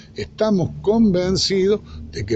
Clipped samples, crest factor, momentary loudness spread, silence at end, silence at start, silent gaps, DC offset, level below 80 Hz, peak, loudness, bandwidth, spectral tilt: under 0.1%; 12 dB; 14 LU; 0 s; 0.15 s; none; under 0.1%; -40 dBFS; -6 dBFS; -19 LUFS; 8.4 kHz; -5.5 dB/octave